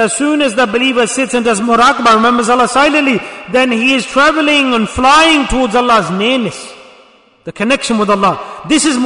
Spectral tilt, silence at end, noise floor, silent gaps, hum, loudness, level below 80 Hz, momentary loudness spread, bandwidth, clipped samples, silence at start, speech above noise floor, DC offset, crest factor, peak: -3 dB/octave; 0 s; -45 dBFS; none; none; -11 LUFS; -36 dBFS; 8 LU; 11 kHz; under 0.1%; 0 s; 33 dB; under 0.1%; 12 dB; 0 dBFS